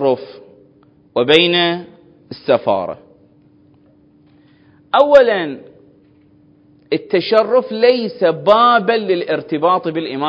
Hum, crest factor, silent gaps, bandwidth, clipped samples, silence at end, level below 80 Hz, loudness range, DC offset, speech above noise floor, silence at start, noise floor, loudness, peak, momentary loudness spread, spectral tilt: none; 16 dB; none; 8 kHz; 0.1%; 0 s; -60 dBFS; 5 LU; under 0.1%; 36 dB; 0 s; -50 dBFS; -14 LUFS; 0 dBFS; 16 LU; -6 dB/octave